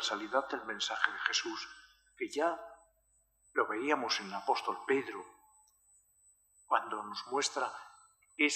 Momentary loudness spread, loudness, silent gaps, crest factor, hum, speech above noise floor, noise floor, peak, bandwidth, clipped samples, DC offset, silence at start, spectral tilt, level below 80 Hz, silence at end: 15 LU; -35 LUFS; none; 26 dB; none; 38 dB; -73 dBFS; -10 dBFS; 14.5 kHz; under 0.1%; under 0.1%; 0 s; -1.5 dB/octave; -78 dBFS; 0 s